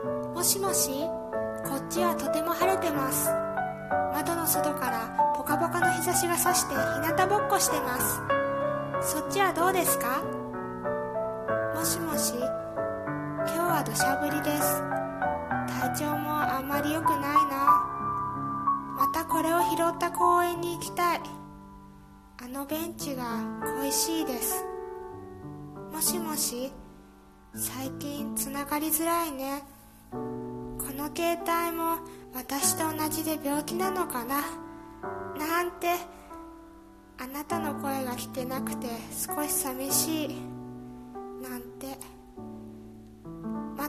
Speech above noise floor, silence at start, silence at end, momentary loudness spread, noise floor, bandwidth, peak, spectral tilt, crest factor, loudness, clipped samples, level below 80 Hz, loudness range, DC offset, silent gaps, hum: 25 dB; 0 s; 0 s; 16 LU; -53 dBFS; 14.5 kHz; -10 dBFS; -3.5 dB/octave; 20 dB; -28 LUFS; under 0.1%; -56 dBFS; 7 LU; under 0.1%; none; none